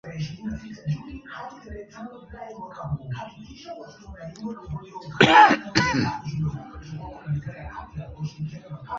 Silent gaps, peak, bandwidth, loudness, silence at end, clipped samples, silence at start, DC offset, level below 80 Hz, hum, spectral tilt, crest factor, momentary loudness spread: none; 0 dBFS; 7.8 kHz; -23 LUFS; 0 s; under 0.1%; 0.05 s; under 0.1%; -48 dBFS; none; -5 dB/octave; 26 dB; 23 LU